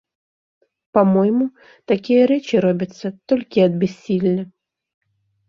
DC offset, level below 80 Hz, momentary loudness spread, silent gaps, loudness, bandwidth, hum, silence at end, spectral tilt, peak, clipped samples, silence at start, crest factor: under 0.1%; -62 dBFS; 10 LU; none; -18 LUFS; 7.2 kHz; none; 1.05 s; -8 dB/octave; -2 dBFS; under 0.1%; 0.95 s; 18 dB